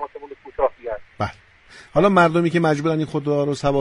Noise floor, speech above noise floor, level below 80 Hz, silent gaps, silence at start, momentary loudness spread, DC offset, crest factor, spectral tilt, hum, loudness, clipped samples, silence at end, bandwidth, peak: -39 dBFS; 20 dB; -46 dBFS; none; 0 s; 17 LU; under 0.1%; 18 dB; -7 dB/octave; none; -20 LUFS; under 0.1%; 0 s; 11.5 kHz; -2 dBFS